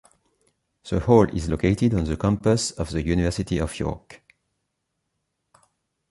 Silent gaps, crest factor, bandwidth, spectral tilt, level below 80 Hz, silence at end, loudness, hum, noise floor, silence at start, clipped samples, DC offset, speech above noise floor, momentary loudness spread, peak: none; 22 dB; 11.5 kHz; -6.5 dB/octave; -38 dBFS; 1.95 s; -23 LUFS; none; -78 dBFS; 0.85 s; under 0.1%; under 0.1%; 56 dB; 10 LU; -2 dBFS